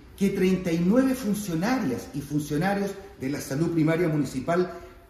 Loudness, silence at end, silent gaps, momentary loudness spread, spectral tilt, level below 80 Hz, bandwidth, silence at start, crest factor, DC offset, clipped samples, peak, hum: -26 LUFS; 0.1 s; none; 9 LU; -6.5 dB/octave; -52 dBFS; 15 kHz; 0 s; 18 dB; under 0.1%; under 0.1%; -8 dBFS; none